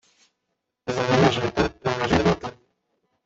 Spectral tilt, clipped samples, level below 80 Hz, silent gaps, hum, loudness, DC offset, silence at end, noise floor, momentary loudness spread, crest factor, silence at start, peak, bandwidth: -5.5 dB/octave; under 0.1%; -46 dBFS; none; none; -22 LUFS; under 0.1%; 0.7 s; -79 dBFS; 12 LU; 20 dB; 0.85 s; -4 dBFS; 7.8 kHz